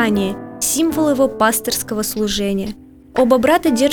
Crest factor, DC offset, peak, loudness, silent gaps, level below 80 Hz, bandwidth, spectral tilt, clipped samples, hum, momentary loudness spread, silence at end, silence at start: 16 dB; under 0.1%; -2 dBFS; -17 LUFS; none; -42 dBFS; over 20 kHz; -3.5 dB/octave; under 0.1%; none; 10 LU; 0 s; 0 s